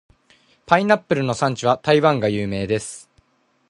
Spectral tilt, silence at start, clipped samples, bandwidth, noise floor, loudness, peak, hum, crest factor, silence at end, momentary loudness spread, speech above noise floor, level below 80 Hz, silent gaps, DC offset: -5.5 dB/octave; 0.7 s; under 0.1%; 11.5 kHz; -63 dBFS; -19 LUFS; 0 dBFS; none; 20 dB; 0.7 s; 8 LU; 44 dB; -52 dBFS; none; under 0.1%